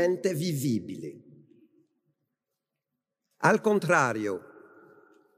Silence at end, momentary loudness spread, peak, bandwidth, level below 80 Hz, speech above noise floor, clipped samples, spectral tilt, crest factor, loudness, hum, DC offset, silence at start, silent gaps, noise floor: 0.8 s; 16 LU; -8 dBFS; 15.5 kHz; -78 dBFS; 59 dB; under 0.1%; -5.5 dB/octave; 22 dB; -27 LUFS; none; under 0.1%; 0 s; none; -86 dBFS